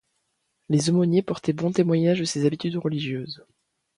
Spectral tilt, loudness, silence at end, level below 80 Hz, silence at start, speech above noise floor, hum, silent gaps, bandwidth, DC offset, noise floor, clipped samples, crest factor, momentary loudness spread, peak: -6 dB/octave; -24 LUFS; 0.65 s; -64 dBFS; 0.7 s; 51 dB; none; none; 11 kHz; under 0.1%; -74 dBFS; under 0.1%; 16 dB; 10 LU; -8 dBFS